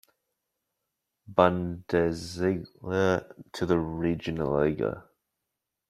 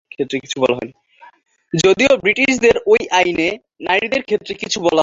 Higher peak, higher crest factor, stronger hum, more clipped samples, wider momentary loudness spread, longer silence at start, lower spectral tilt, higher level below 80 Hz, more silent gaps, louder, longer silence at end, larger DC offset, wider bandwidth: about the same, -4 dBFS vs -2 dBFS; first, 26 dB vs 16 dB; neither; neither; about the same, 9 LU vs 10 LU; first, 1.3 s vs 0.2 s; first, -7 dB/octave vs -3.5 dB/octave; second, -56 dBFS vs -50 dBFS; neither; second, -28 LUFS vs -16 LUFS; first, 0.9 s vs 0 s; neither; first, 14 kHz vs 8 kHz